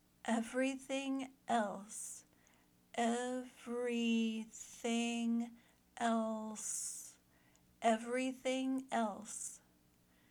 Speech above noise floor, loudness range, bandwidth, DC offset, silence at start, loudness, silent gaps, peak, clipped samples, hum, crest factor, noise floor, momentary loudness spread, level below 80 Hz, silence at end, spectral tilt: 32 dB; 2 LU; 19 kHz; under 0.1%; 0.25 s; -39 LUFS; none; -20 dBFS; under 0.1%; none; 20 dB; -71 dBFS; 11 LU; -80 dBFS; 0.75 s; -3 dB/octave